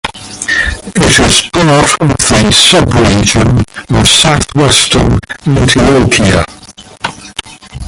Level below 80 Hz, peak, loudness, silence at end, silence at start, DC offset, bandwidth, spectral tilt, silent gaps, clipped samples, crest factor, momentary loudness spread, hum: -22 dBFS; 0 dBFS; -7 LUFS; 0 s; 0.05 s; under 0.1%; 16 kHz; -3.5 dB/octave; none; 0.4%; 8 dB; 15 LU; none